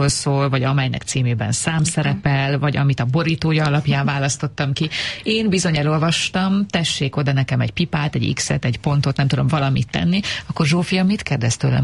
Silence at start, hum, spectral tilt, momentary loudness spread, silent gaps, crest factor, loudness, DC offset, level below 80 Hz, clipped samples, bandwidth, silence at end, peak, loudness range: 0 s; none; -5 dB/octave; 3 LU; none; 14 dB; -19 LUFS; 0.1%; -44 dBFS; under 0.1%; 11.5 kHz; 0 s; -4 dBFS; 1 LU